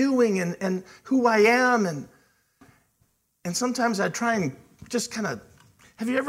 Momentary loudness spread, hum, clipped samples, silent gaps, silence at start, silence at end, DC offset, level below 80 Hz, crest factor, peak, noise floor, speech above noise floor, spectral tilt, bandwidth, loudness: 14 LU; none; under 0.1%; none; 0 s; 0 s; under 0.1%; -68 dBFS; 18 dB; -8 dBFS; -69 dBFS; 45 dB; -4.5 dB/octave; 16 kHz; -24 LUFS